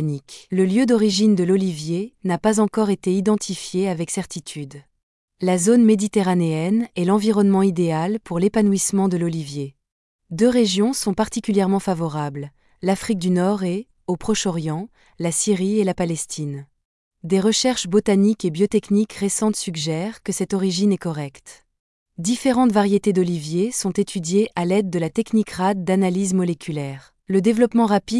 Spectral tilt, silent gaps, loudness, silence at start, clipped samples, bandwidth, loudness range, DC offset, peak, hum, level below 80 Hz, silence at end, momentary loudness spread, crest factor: -5.5 dB/octave; 5.03-5.28 s, 9.92-10.19 s, 16.85-17.11 s, 21.80-22.06 s; -20 LUFS; 0 s; under 0.1%; 12 kHz; 4 LU; under 0.1%; -4 dBFS; none; -54 dBFS; 0 s; 11 LU; 16 dB